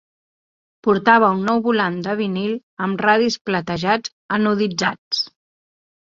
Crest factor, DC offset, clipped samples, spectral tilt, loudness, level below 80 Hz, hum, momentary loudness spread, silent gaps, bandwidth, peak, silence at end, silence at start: 18 dB; under 0.1%; under 0.1%; -5 dB/octave; -19 LUFS; -60 dBFS; none; 10 LU; 2.63-2.77 s, 3.41-3.45 s, 4.12-4.29 s, 4.98-5.11 s; 7.6 kHz; -2 dBFS; 0.75 s; 0.85 s